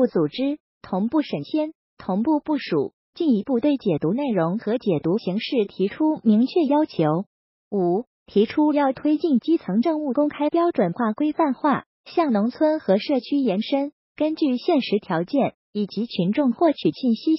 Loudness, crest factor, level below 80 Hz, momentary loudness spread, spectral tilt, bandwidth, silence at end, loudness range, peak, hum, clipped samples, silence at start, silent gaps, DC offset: -22 LUFS; 14 dB; -66 dBFS; 7 LU; -6 dB/octave; 5.8 kHz; 0 s; 2 LU; -8 dBFS; none; under 0.1%; 0 s; 0.60-0.81 s, 1.75-1.97 s, 2.93-3.13 s, 7.27-7.71 s, 8.07-8.26 s, 11.86-12.04 s, 13.93-14.15 s, 15.54-15.73 s; under 0.1%